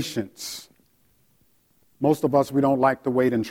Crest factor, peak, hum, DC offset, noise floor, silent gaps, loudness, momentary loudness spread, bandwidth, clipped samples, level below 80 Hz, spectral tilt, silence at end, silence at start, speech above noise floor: 18 dB; -6 dBFS; none; under 0.1%; -64 dBFS; none; -23 LUFS; 14 LU; 17 kHz; under 0.1%; -64 dBFS; -6 dB/octave; 0 s; 0 s; 42 dB